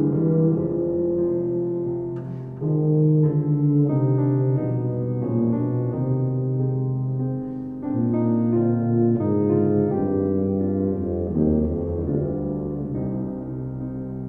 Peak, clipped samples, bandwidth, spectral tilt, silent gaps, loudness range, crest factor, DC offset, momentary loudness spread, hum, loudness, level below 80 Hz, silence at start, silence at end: -8 dBFS; under 0.1%; 2.3 kHz; -14 dB/octave; none; 3 LU; 14 dB; under 0.1%; 9 LU; none; -23 LUFS; -44 dBFS; 0 s; 0 s